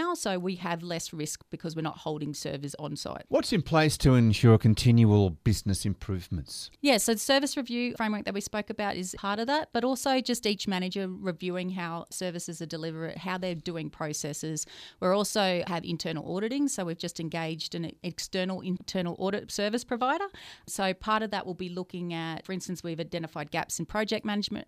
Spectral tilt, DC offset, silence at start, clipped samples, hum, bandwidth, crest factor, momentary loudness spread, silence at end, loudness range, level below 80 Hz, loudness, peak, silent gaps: -5 dB/octave; under 0.1%; 0 s; under 0.1%; none; 15.5 kHz; 22 dB; 13 LU; 0.05 s; 9 LU; -52 dBFS; -29 LUFS; -6 dBFS; none